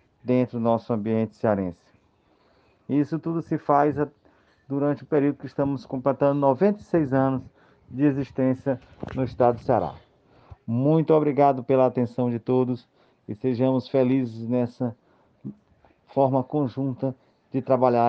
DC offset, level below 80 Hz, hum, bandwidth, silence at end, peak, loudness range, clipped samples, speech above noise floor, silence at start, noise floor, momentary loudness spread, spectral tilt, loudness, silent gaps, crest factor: under 0.1%; -60 dBFS; none; 6.4 kHz; 0 s; -6 dBFS; 4 LU; under 0.1%; 40 dB; 0.25 s; -63 dBFS; 11 LU; -10 dB/octave; -24 LUFS; none; 18 dB